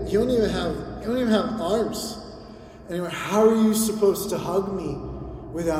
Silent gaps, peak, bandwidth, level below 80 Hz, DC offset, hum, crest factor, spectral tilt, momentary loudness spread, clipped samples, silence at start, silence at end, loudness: none; -6 dBFS; 16 kHz; -44 dBFS; under 0.1%; none; 18 dB; -5 dB/octave; 16 LU; under 0.1%; 0 s; 0 s; -24 LUFS